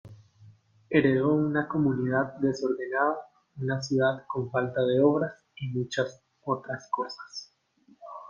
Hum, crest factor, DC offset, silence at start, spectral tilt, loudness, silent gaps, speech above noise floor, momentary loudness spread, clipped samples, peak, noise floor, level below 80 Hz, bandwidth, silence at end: none; 20 dB; under 0.1%; 0.05 s; -7 dB/octave; -28 LUFS; none; 35 dB; 14 LU; under 0.1%; -8 dBFS; -62 dBFS; -66 dBFS; 7.4 kHz; 0 s